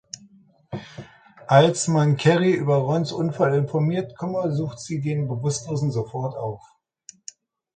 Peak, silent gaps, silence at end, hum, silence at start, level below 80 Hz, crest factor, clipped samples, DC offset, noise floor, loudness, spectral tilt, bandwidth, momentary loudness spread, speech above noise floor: -2 dBFS; none; 1.2 s; none; 0.7 s; -60 dBFS; 22 dB; under 0.1%; under 0.1%; -54 dBFS; -22 LUFS; -6 dB/octave; 9.4 kHz; 22 LU; 33 dB